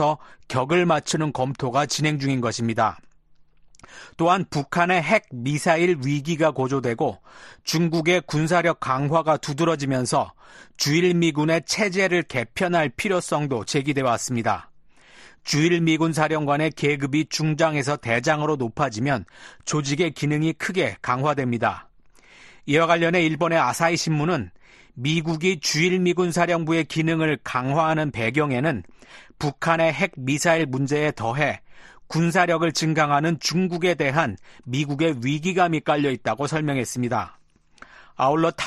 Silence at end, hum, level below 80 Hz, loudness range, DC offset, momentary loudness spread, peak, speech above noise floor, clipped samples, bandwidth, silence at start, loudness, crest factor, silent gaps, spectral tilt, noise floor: 0 s; none; -56 dBFS; 2 LU; under 0.1%; 6 LU; -4 dBFS; 31 dB; under 0.1%; 13 kHz; 0 s; -22 LUFS; 18 dB; none; -5 dB/octave; -53 dBFS